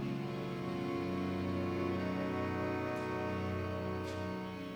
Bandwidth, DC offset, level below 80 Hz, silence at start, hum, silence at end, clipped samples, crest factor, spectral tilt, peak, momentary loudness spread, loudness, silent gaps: over 20 kHz; under 0.1%; -64 dBFS; 0 s; none; 0 s; under 0.1%; 14 dB; -7.5 dB/octave; -24 dBFS; 4 LU; -38 LUFS; none